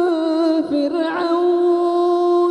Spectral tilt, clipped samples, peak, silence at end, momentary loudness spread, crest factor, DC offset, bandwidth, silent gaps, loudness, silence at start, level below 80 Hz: -5.5 dB/octave; under 0.1%; -8 dBFS; 0 s; 4 LU; 8 dB; under 0.1%; 8.6 kHz; none; -17 LUFS; 0 s; -64 dBFS